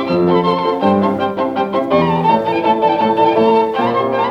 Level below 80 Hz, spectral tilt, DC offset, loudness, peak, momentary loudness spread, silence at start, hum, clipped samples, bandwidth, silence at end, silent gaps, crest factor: -52 dBFS; -8 dB/octave; under 0.1%; -14 LUFS; -2 dBFS; 5 LU; 0 s; none; under 0.1%; 7.6 kHz; 0 s; none; 12 dB